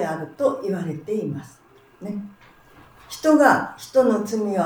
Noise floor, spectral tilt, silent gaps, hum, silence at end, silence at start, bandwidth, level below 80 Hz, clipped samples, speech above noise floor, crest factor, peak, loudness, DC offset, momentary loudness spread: -50 dBFS; -6 dB/octave; none; none; 0 s; 0 s; over 20 kHz; -62 dBFS; under 0.1%; 29 dB; 20 dB; -2 dBFS; -21 LUFS; under 0.1%; 19 LU